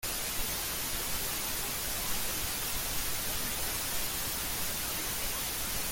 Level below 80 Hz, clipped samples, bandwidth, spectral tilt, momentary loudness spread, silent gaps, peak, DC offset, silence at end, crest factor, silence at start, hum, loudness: -46 dBFS; under 0.1%; 17 kHz; -1 dB/octave; 1 LU; none; -20 dBFS; under 0.1%; 0 s; 14 dB; 0 s; none; -32 LUFS